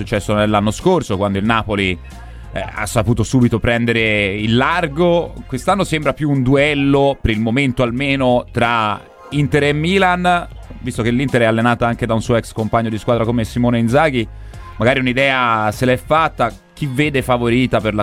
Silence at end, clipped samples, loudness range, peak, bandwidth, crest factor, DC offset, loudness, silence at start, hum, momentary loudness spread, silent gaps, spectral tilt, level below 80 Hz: 0 s; under 0.1%; 2 LU; 0 dBFS; 15.5 kHz; 16 dB; under 0.1%; -16 LUFS; 0 s; none; 9 LU; none; -6 dB/octave; -34 dBFS